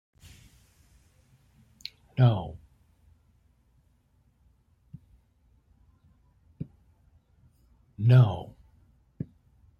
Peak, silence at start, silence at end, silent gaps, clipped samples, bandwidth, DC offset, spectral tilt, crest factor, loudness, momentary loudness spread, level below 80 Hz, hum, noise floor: -8 dBFS; 2.15 s; 1.35 s; none; under 0.1%; 5.2 kHz; under 0.1%; -9 dB/octave; 24 dB; -25 LUFS; 24 LU; -60 dBFS; none; -66 dBFS